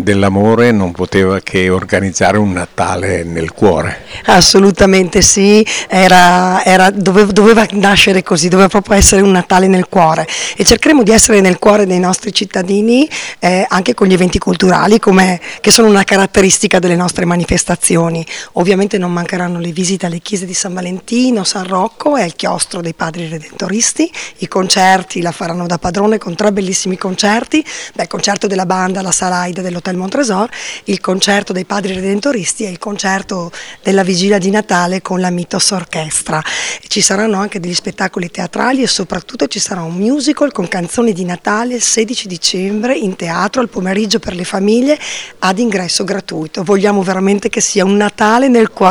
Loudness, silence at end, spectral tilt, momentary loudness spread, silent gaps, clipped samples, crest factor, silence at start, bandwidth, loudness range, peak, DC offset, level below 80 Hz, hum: -11 LUFS; 0 s; -4 dB/octave; 11 LU; none; 1%; 12 dB; 0 s; over 20 kHz; 7 LU; 0 dBFS; under 0.1%; -34 dBFS; none